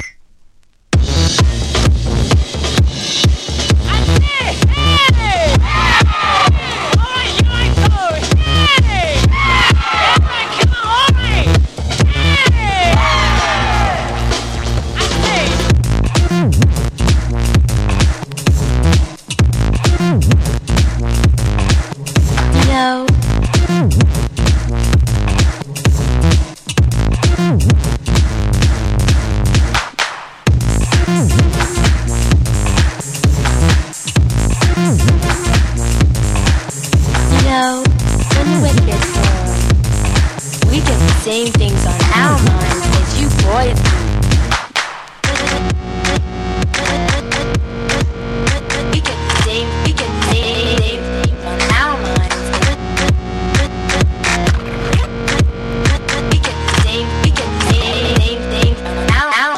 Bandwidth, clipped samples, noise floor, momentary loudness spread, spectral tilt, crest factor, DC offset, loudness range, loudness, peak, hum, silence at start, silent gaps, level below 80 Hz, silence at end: 14.5 kHz; under 0.1%; -45 dBFS; 6 LU; -4.5 dB/octave; 12 dB; under 0.1%; 4 LU; -14 LUFS; 0 dBFS; none; 0 s; none; -16 dBFS; 0 s